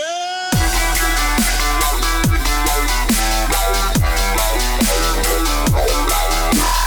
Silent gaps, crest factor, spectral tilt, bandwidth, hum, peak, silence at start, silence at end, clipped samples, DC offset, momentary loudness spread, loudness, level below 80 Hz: none; 8 dB; -3 dB/octave; over 20 kHz; none; -6 dBFS; 0 s; 0 s; under 0.1%; under 0.1%; 1 LU; -16 LUFS; -20 dBFS